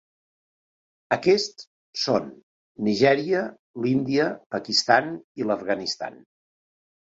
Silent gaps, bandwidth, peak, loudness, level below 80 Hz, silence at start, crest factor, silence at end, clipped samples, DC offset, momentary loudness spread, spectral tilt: 1.67-1.93 s, 2.43-2.75 s, 3.59-3.74 s, 4.46-4.50 s, 5.24-5.35 s; 8 kHz; -4 dBFS; -24 LUFS; -66 dBFS; 1.1 s; 20 dB; 0.9 s; under 0.1%; under 0.1%; 13 LU; -4.5 dB/octave